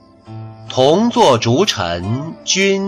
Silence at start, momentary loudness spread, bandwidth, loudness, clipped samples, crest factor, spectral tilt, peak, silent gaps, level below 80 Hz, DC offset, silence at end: 0.3 s; 18 LU; 13.5 kHz; -15 LUFS; under 0.1%; 14 dB; -4 dB/octave; -2 dBFS; none; -50 dBFS; under 0.1%; 0 s